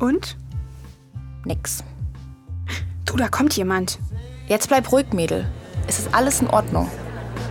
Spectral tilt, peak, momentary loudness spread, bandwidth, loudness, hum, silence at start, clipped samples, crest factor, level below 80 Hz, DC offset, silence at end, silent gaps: -4.5 dB/octave; -2 dBFS; 16 LU; 19 kHz; -22 LUFS; none; 0 s; under 0.1%; 20 dB; -36 dBFS; under 0.1%; 0 s; none